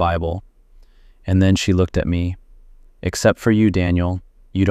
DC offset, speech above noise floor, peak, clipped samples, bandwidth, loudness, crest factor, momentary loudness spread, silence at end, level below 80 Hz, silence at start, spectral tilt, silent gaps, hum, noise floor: under 0.1%; 31 dB; -2 dBFS; under 0.1%; 14 kHz; -19 LUFS; 16 dB; 13 LU; 0 s; -36 dBFS; 0 s; -6.5 dB/octave; none; none; -48 dBFS